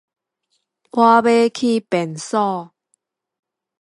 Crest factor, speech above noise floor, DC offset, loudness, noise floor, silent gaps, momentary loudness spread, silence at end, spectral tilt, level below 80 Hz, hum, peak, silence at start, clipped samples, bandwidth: 18 dB; 55 dB; under 0.1%; -17 LUFS; -71 dBFS; none; 10 LU; 1.15 s; -5 dB/octave; -70 dBFS; none; 0 dBFS; 0.95 s; under 0.1%; 11.5 kHz